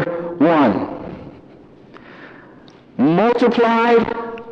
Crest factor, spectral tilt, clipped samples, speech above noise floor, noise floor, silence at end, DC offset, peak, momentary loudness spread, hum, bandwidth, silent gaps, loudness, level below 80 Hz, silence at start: 14 dB; -7.5 dB/octave; under 0.1%; 29 dB; -44 dBFS; 0 s; under 0.1%; -4 dBFS; 18 LU; none; 7.2 kHz; none; -16 LUFS; -54 dBFS; 0 s